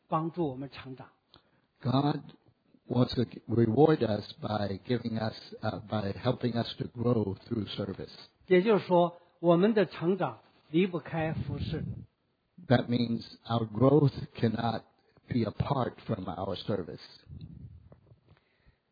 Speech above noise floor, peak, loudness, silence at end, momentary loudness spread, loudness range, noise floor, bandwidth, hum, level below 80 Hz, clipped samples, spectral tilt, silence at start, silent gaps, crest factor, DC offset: 46 dB; -10 dBFS; -30 LUFS; 1.15 s; 18 LU; 6 LU; -75 dBFS; 5 kHz; none; -58 dBFS; under 0.1%; -9.5 dB/octave; 0.1 s; none; 22 dB; under 0.1%